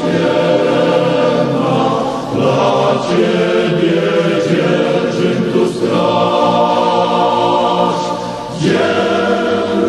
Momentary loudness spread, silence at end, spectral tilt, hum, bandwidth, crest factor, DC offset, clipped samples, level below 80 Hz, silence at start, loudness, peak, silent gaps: 3 LU; 0 s; -6 dB/octave; none; 12 kHz; 12 dB; under 0.1%; under 0.1%; -50 dBFS; 0 s; -13 LUFS; 0 dBFS; none